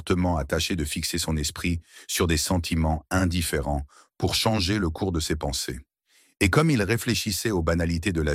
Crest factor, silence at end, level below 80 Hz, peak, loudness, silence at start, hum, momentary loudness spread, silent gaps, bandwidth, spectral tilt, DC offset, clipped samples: 20 dB; 0 s; -36 dBFS; -6 dBFS; -25 LUFS; 0 s; none; 7 LU; none; 16.5 kHz; -4.5 dB/octave; under 0.1%; under 0.1%